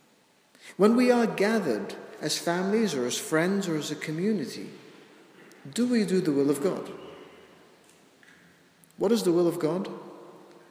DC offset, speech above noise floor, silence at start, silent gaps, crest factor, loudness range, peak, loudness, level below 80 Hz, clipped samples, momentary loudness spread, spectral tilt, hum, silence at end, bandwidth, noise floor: under 0.1%; 37 dB; 0.65 s; none; 20 dB; 5 LU; -8 dBFS; -26 LUFS; -78 dBFS; under 0.1%; 20 LU; -5 dB/octave; none; 0.35 s; 16 kHz; -63 dBFS